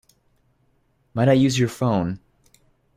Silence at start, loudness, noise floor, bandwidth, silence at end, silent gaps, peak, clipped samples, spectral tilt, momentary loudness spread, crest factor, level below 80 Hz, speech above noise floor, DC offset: 1.15 s; -21 LUFS; -65 dBFS; 15 kHz; 0.8 s; none; -4 dBFS; under 0.1%; -6.5 dB/octave; 15 LU; 20 dB; -54 dBFS; 45 dB; under 0.1%